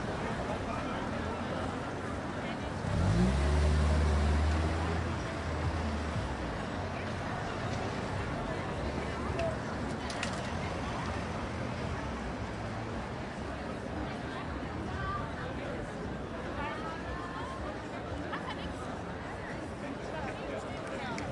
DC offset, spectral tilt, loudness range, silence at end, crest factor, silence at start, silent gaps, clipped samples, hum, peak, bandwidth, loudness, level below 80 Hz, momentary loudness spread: under 0.1%; -6 dB/octave; 8 LU; 0 s; 16 dB; 0 s; none; under 0.1%; none; -18 dBFS; 11.5 kHz; -35 LUFS; -42 dBFS; 10 LU